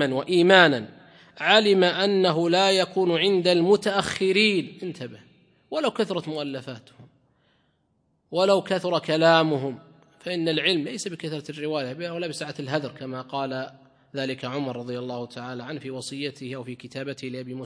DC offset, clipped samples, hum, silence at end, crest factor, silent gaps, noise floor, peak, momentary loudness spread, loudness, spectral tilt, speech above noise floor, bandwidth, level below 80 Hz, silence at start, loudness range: under 0.1%; under 0.1%; none; 0 s; 24 dB; none; -70 dBFS; 0 dBFS; 17 LU; -23 LUFS; -4.5 dB/octave; 46 dB; 10.5 kHz; -70 dBFS; 0 s; 12 LU